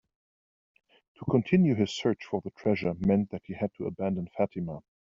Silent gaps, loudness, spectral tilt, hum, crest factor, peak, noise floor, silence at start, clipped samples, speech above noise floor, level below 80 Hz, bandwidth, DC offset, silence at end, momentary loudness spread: none; -29 LUFS; -7 dB/octave; none; 20 dB; -10 dBFS; under -90 dBFS; 1.2 s; under 0.1%; over 62 dB; -60 dBFS; 7.4 kHz; under 0.1%; 0.3 s; 12 LU